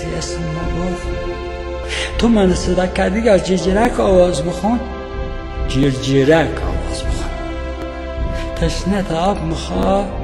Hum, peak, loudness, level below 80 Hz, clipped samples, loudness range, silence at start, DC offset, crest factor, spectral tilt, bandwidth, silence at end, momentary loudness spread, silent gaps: none; 0 dBFS; -18 LUFS; -26 dBFS; under 0.1%; 5 LU; 0 s; under 0.1%; 16 dB; -6 dB/octave; 12 kHz; 0 s; 12 LU; none